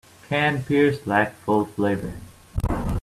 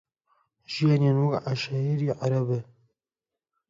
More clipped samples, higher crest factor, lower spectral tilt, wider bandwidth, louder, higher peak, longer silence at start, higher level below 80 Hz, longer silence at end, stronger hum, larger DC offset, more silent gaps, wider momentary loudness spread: neither; about the same, 16 dB vs 16 dB; about the same, -7 dB/octave vs -7.5 dB/octave; first, 14.5 kHz vs 7.6 kHz; first, -23 LUFS vs -26 LUFS; first, -6 dBFS vs -12 dBFS; second, 0.3 s vs 0.7 s; first, -36 dBFS vs -68 dBFS; second, 0 s vs 1.05 s; neither; neither; neither; first, 11 LU vs 8 LU